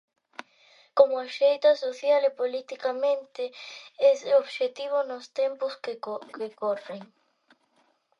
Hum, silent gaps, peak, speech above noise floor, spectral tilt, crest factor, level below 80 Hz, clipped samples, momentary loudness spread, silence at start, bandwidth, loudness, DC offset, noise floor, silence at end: none; none; -6 dBFS; 42 dB; -3 dB/octave; 22 dB; -84 dBFS; under 0.1%; 19 LU; 0.95 s; 7.6 kHz; -26 LUFS; under 0.1%; -68 dBFS; 1.15 s